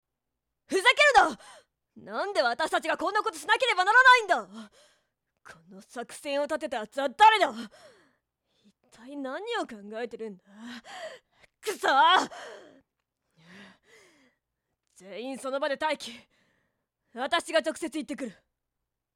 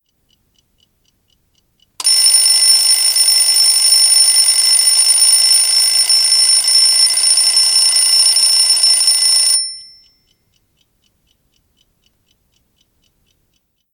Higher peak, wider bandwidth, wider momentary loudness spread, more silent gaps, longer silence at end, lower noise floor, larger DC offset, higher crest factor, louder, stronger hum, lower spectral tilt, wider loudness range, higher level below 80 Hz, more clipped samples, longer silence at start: second, -8 dBFS vs 0 dBFS; second, 15.5 kHz vs 18.5 kHz; first, 24 LU vs 2 LU; neither; second, 0.85 s vs 4.1 s; first, -85 dBFS vs -64 dBFS; neither; first, 20 dB vs 14 dB; second, -25 LUFS vs -8 LUFS; neither; first, -1.5 dB/octave vs 5.5 dB/octave; first, 15 LU vs 5 LU; about the same, -70 dBFS vs -66 dBFS; neither; second, 0.7 s vs 2 s